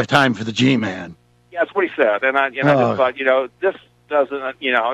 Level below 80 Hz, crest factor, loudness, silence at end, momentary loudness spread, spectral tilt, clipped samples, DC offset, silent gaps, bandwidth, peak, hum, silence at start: -60 dBFS; 16 dB; -18 LUFS; 0 s; 8 LU; -5.5 dB/octave; under 0.1%; under 0.1%; none; 13 kHz; -2 dBFS; 60 Hz at -55 dBFS; 0 s